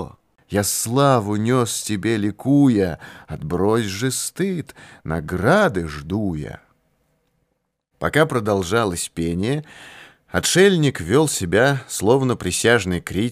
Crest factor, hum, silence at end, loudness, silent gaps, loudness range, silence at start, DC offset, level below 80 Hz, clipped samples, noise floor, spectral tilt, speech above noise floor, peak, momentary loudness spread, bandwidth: 18 dB; none; 0 s; -19 LUFS; none; 5 LU; 0 s; under 0.1%; -46 dBFS; under 0.1%; -73 dBFS; -5 dB/octave; 53 dB; -2 dBFS; 12 LU; 15.5 kHz